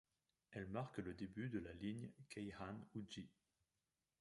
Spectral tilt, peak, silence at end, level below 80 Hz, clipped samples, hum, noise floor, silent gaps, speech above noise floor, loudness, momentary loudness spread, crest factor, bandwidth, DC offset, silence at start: -6.5 dB/octave; -34 dBFS; 0.9 s; -72 dBFS; under 0.1%; none; under -90 dBFS; none; over 40 dB; -51 LUFS; 7 LU; 18 dB; 11.5 kHz; under 0.1%; 0.5 s